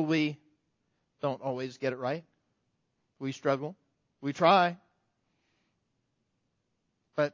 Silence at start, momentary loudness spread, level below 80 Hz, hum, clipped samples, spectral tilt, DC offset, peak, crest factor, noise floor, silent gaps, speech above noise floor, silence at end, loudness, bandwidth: 0 s; 16 LU; -80 dBFS; none; under 0.1%; -6 dB/octave; under 0.1%; -10 dBFS; 24 dB; -79 dBFS; none; 50 dB; 0.05 s; -30 LUFS; 7.6 kHz